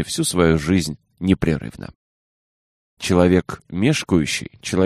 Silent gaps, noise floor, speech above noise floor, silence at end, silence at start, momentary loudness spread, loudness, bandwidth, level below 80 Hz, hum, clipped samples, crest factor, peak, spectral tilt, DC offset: 1.95-2.97 s; under -90 dBFS; over 71 dB; 0 s; 0 s; 13 LU; -20 LUFS; 15 kHz; -40 dBFS; none; under 0.1%; 18 dB; -2 dBFS; -5.5 dB/octave; under 0.1%